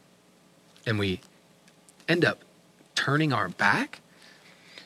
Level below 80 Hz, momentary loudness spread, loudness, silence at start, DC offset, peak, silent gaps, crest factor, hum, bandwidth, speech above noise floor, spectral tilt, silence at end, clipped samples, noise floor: -70 dBFS; 14 LU; -27 LUFS; 0.85 s; under 0.1%; -8 dBFS; none; 22 dB; none; 15 kHz; 34 dB; -5 dB/octave; 0.05 s; under 0.1%; -59 dBFS